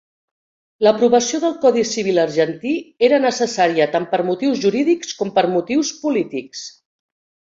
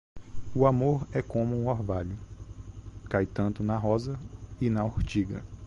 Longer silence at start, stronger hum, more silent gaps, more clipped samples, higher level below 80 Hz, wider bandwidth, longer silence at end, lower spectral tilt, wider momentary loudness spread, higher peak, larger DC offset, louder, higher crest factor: first, 0.8 s vs 0.15 s; neither; neither; neither; second, -64 dBFS vs -44 dBFS; about the same, 7.8 kHz vs 7.6 kHz; first, 0.85 s vs 0 s; second, -4 dB/octave vs -8.5 dB/octave; second, 8 LU vs 19 LU; first, -2 dBFS vs -8 dBFS; neither; first, -18 LUFS vs -29 LUFS; about the same, 16 dB vs 20 dB